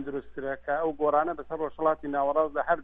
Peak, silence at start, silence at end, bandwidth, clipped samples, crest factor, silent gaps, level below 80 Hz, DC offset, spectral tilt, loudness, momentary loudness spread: -12 dBFS; 0 s; 0 s; 3.8 kHz; under 0.1%; 16 dB; none; -56 dBFS; under 0.1%; -9 dB/octave; -28 LUFS; 9 LU